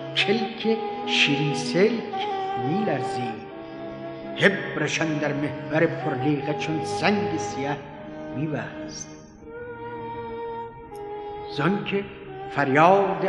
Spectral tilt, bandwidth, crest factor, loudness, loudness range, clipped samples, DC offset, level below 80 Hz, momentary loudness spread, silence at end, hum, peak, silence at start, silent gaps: -5 dB/octave; 11.5 kHz; 24 dB; -25 LUFS; 9 LU; under 0.1%; under 0.1%; -58 dBFS; 16 LU; 0 s; none; -2 dBFS; 0 s; none